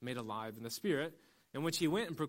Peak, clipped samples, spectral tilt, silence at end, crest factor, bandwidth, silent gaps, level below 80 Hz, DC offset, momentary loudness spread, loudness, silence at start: -22 dBFS; under 0.1%; -4.5 dB/octave; 0 s; 16 dB; 16.5 kHz; none; -74 dBFS; under 0.1%; 9 LU; -38 LUFS; 0 s